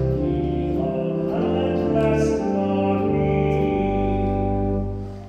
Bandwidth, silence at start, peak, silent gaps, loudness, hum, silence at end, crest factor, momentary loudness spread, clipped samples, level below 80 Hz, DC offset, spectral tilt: 9.6 kHz; 0 s; -8 dBFS; none; -22 LUFS; none; 0 s; 12 dB; 4 LU; under 0.1%; -34 dBFS; under 0.1%; -8.5 dB/octave